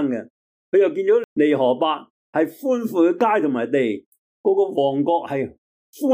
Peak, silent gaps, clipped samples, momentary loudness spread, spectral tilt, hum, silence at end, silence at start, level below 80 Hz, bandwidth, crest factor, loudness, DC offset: -8 dBFS; 0.30-0.72 s, 1.24-1.36 s, 2.10-2.33 s, 4.06-4.12 s, 4.18-4.44 s, 5.58-5.93 s; under 0.1%; 9 LU; -6.5 dB/octave; none; 0 s; 0 s; -72 dBFS; 16 kHz; 14 dB; -20 LUFS; under 0.1%